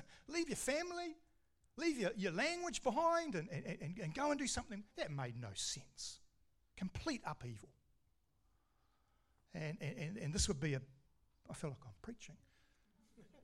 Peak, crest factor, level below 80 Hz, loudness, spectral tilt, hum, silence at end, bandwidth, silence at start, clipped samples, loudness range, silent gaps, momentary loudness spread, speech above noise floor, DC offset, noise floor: -24 dBFS; 20 dB; -60 dBFS; -42 LUFS; -4 dB/octave; none; 0 s; 15.5 kHz; 0 s; under 0.1%; 10 LU; none; 16 LU; 38 dB; under 0.1%; -80 dBFS